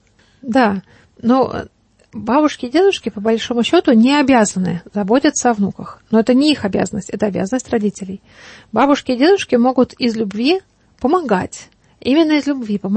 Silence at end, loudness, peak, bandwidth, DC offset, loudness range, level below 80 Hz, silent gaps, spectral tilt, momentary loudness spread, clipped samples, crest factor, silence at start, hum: 0 s; -16 LUFS; -2 dBFS; 8.8 kHz; under 0.1%; 3 LU; -50 dBFS; none; -5 dB/octave; 13 LU; under 0.1%; 14 dB; 0.45 s; none